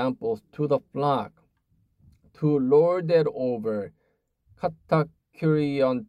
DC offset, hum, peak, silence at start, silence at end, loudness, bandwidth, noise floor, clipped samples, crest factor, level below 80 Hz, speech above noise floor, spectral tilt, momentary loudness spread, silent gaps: under 0.1%; none; -10 dBFS; 0 s; 0.05 s; -25 LUFS; 9.6 kHz; -72 dBFS; under 0.1%; 16 dB; -64 dBFS; 48 dB; -9 dB/octave; 12 LU; none